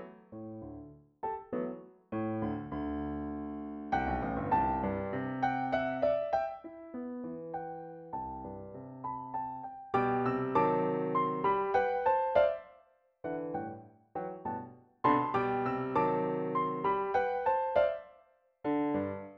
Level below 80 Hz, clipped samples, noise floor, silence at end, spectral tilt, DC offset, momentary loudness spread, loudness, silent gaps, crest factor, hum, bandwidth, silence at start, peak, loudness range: -56 dBFS; under 0.1%; -65 dBFS; 0 s; -8.5 dB/octave; under 0.1%; 15 LU; -33 LUFS; none; 20 dB; none; 6.6 kHz; 0 s; -12 dBFS; 8 LU